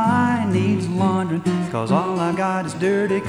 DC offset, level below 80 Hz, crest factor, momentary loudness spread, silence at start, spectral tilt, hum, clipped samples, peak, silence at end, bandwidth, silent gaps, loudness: under 0.1%; -58 dBFS; 14 dB; 3 LU; 0 s; -7 dB/octave; none; under 0.1%; -4 dBFS; 0 s; 11.5 kHz; none; -20 LUFS